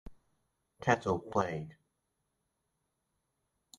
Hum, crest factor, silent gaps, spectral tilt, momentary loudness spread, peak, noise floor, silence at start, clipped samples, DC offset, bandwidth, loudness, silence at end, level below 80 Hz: none; 26 dB; none; -6 dB/octave; 11 LU; -14 dBFS; -83 dBFS; 0.05 s; under 0.1%; under 0.1%; 11.5 kHz; -33 LUFS; 2.05 s; -64 dBFS